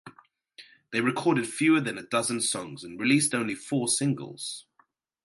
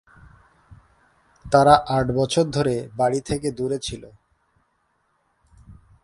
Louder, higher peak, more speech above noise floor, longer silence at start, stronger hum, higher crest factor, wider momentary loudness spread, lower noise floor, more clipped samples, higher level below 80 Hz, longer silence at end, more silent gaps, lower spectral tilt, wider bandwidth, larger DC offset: second, -27 LUFS vs -21 LUFS; second, -10 dBFS vs 0 dBFS; second, 40 dB vs 48 dB; second, 0.05 s vs 0.7 s; neither; about the same, 20 dB vs 24 dB; about the same, 12 LU vs 12 LU; about the same, -67 dBFS vs -68 dBFS; neither; second, -72 dBFS vs -48 dBFS; first, 0.65 s vs 0.3 s; neither; second, -3.5 dB/octave vs -5.5 dB/octave; about the same, 12 kHz vs 11.5 kHz; neither